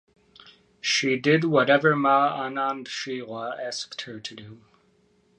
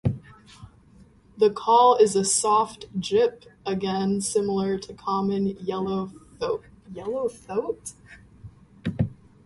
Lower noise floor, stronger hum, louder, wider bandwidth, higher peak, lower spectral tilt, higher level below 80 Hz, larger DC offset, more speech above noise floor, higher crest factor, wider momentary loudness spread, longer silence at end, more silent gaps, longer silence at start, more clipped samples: first, -63 dBFS vs -53 dBFS; neither; about the same, -24 LUFS vs -24 LUFS; about the same, 11 kHz vs 11.5 kHz; about the same, -6 dBFS vs -6 dBFS; about the same, -4.5 dB/octave vs -5 dB/octave; second, -72 dBFS vs -52 dBFS; neither; first, 39 dB vs 30 dB; about the same, 20 dB vs 18 dB; about the same, 15 LU vs 16 LU; first, 0.8 s vs 0.35 s; neither; first, 0.85 s vs 0.05 s; neither